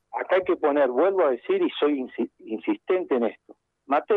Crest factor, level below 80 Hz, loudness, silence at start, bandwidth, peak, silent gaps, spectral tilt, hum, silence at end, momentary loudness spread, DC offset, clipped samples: 14 dB; -72 dBFS; -24 LUFS; 0.15 s; 4.2 kHz; -10 dBFS; none; -7.5 dB/octave; none; 0 s; 9 LU; under 0.1%; under 0.1%